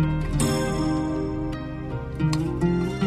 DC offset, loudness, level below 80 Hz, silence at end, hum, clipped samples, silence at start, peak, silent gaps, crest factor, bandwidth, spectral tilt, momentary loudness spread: under 0.1%; -26 LUFS; -36 dBFS; 0 s; none; under 0.1%; 0 s; -10 dBFS; none; 14 dB; 14 kHz; -6.5 dB/octave; 8 LU